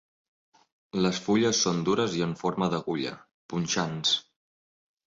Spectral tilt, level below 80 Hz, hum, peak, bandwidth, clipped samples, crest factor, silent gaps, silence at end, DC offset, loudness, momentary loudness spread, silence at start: -4 dB/octave; -62 dBFS; none; -12 dBFS; 7.8 kHz; under 0.1%; 16 dB; 3.34-3.49 s; 0.85 s; under 0.1%; -27 LUFS; 10 LU; 0.95 s